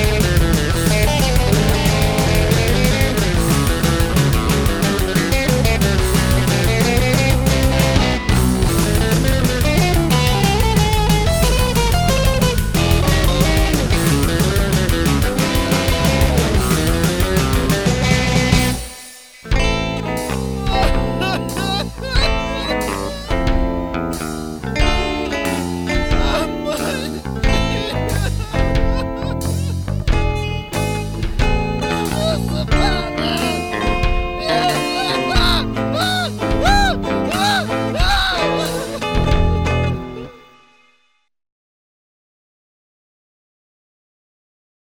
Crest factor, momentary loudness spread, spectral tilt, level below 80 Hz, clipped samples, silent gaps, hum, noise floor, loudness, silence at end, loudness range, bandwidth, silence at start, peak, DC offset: 16 dB; 7 LU; -5 dB/octave; -22 dBFS; under 0.1%; none; none; -62 dBFS; -17 LUFS; 4.55 s; 5 LU; over 20 kHz; 0 s; 0 dBFS; under 0.1%